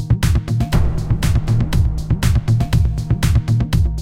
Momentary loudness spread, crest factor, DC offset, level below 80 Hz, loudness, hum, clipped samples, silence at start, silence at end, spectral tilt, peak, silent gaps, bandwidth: 3 LU; 12 dB; 1%; -20 dBFS; -18 LUFS; none; under 0.1%; 0 s; 0 s; -6.5 dB/octave; -4 dBFS; none; 16 kHz